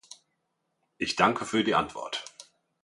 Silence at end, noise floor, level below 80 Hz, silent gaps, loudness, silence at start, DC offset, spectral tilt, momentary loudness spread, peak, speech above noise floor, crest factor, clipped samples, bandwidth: 0.4 s; -78 dBFS; -64 dBFS; none; -28 LUFS; 0.1 s; under 0.1%; -4 dB/octave; 12 LU; -4 dBFS; 51 dB; 26 dB; under 0.1%; 11.5 kHz